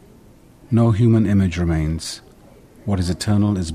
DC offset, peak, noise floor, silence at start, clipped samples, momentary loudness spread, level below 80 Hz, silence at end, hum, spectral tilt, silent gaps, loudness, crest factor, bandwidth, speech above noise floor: under 0.1%; -4 dBFS; -47 dBFS; 0.7 s; under 0.1%; 13 LU; -36 dBFS; 0 s; none; -7 dB/octave; none; -19 LUFS; 14 dB; 13 kHz; 30 dB